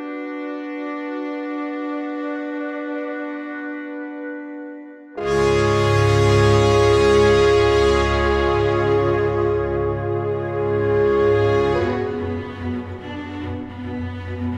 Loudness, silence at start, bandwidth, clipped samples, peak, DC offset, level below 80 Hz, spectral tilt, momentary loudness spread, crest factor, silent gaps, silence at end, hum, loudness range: -20 LUFS; 0 s; 11 kHz; under 0.1%; -4 dBFS; under 0.1%; -34 dBFS; -6.5 dB/octave; 15 LU; 16 dB; none; 0 s; none; 12 LU